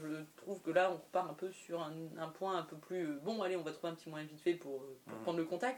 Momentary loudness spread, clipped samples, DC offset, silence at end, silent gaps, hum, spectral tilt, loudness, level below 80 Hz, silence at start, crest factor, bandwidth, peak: 12 LU; under 0.1%; under 0.1%; 0 s; none; none; -5.5 dB/octave; -41 LUFS; -90 dBFS; 0 s; 22 dB; 19 kHz; -18 dBFS